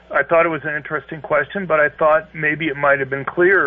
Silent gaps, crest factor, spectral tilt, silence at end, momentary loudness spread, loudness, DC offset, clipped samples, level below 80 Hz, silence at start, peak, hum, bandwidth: none; 14 dB; -4 dB/octave; 0 s; 8 LU; -18 LUFS; under 0.1%; under 0.1%; -54 dBFS; 0.1 s; -4 dBFS; none; 3.8 kHz